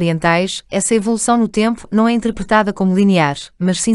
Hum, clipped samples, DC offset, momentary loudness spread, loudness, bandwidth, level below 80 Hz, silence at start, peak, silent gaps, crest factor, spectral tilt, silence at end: none; under 0.1%; under 0.1%; 6 LU; -15 LUFS; 12 kHz; -44 dBFS; 0 s; 0 dBFS; none; 14 dB; -5 dB/octave; 0 s